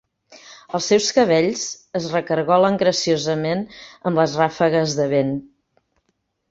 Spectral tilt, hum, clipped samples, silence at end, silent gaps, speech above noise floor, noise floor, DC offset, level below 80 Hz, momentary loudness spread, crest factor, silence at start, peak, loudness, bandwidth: -4.5 dB/octave; none; under 0.1%; 1.05 s; none; 52 dB; -71 dBFS; under 0.1%; -60 dBFS; 11 LU; 18 dB; 0.3 s; -2 dBFS; -19 LUFS; 8 kHz